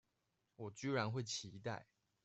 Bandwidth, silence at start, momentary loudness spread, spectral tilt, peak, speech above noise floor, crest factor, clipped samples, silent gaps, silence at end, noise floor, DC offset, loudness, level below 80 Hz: 8.2 kHz; 0.6 s; 12 LU; -4.5 dB/octave; -24 dBFS; 42 dB; 22 dB; under 0.1%; none; 0.4 s; -86 dBFS; under 0.1%; -44 LUFS; -80 dBFS